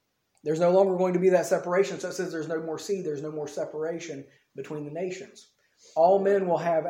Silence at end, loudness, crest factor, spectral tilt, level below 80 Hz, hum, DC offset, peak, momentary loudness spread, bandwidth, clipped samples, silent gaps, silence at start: 0 s; -26 LUFS; 18 dB; -6 dB/octave; -78 dBFS; none; under 0.1%; -10 dBFS; 16 LU; 16.5 kHz; under 0.1%; none; 0.45 s